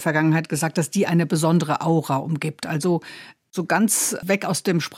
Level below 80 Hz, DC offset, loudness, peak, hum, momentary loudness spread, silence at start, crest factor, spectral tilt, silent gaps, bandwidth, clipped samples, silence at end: -66 dBFS; under 0.1%; -21 LUFS; -6 dBFS; none; 8 LU; 0 s; 16 dB; -5 dB/octave; none; 16.5 kHz; under 0.1%; 0 s